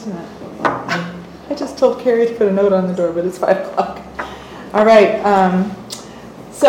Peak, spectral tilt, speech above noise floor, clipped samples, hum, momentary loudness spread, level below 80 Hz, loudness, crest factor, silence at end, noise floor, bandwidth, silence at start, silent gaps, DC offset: 0 dBFS; -6 dB/octave; 20 dB; under 0.1%; none; 20 LU; -50 dBFS; -15 LUFS; 16 dB; 0 s; -35 dBFS; 16.5 kHz; 0 s; none; under 0.1%